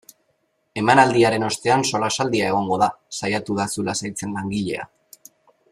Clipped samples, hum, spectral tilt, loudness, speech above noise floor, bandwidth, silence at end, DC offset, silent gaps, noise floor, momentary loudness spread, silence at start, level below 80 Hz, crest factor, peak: under 0.1%; none; -4 dB/octave; -21 LUFS; 48 dB; 15.5 kHz; 0.85 s; under 0.1%; none; -68 dBFS; 12 LU; 0.75 s; -58 dBFS; 20 dB; -2 dBFS